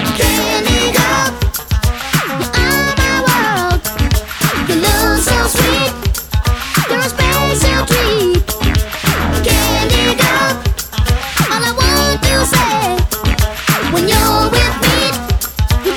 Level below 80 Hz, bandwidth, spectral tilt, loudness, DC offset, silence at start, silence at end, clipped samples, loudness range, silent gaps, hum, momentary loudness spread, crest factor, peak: -20 dBFS; over 20 kHz; -4 dB/octave; -13 LUFS; under 0.1%; 0 s; 0 s; under 0.1%; 1 LU; none; none; 5 LU; 14 dB; 0 dBFS